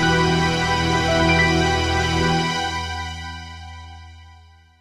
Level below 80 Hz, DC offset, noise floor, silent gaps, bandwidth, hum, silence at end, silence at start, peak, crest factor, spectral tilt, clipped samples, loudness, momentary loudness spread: -34 dBFS; under 0.1%; -48 dBFS; none; 13.5 kHz; none; 0.5 s; 0 s; -4 dBFS; 18 dB; -4.5 dB/octave; under 0.1%; -19 LUFS; 20 LU